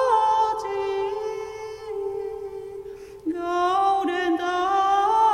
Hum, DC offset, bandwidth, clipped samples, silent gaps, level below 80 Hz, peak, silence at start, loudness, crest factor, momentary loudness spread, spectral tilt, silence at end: none; under 0.1%; 13 kHz; under 0.1%; none; -58 dBFS; -8 dBFS; 0 s; -24 LUFS; 14 dB; 15 LU; -4 dB/octave; 0 s